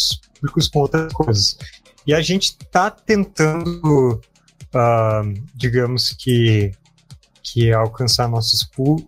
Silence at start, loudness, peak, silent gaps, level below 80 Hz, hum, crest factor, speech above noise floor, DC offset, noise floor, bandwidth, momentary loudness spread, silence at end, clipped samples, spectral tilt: 0 s; -18 LUFS; -2 dBFS; none; -40 dBFS; none; 16 dB; 28 dB; under 0.1%; -46 dBFS; 16 kHz; 8 LU; 0.05 s; under 0.1%; -5 dB/octave